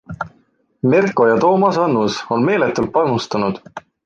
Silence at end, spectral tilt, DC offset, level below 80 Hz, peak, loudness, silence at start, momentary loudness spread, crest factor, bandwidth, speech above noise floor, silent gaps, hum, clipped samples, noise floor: 0.25 s; -6.5 dB/octave; under 0.1%; -54 dBFS; -2 dBFS; -16 LUFS; 0.1 s; 16 LU; 14 dB; 8.8 kHz; 43 dB; none; none; under 0.1%; -58 dBFS